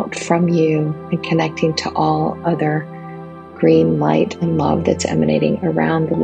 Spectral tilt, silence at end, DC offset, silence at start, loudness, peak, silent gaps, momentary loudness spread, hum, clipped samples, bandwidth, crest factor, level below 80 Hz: -6.5 dB/octave; 0 s; under 0.1%; 0 s; -17 LUFS; 0 dBFS; none; 9 LU; none; under 0.1%; 9.4 kHz; 16 dB; -54 dBFS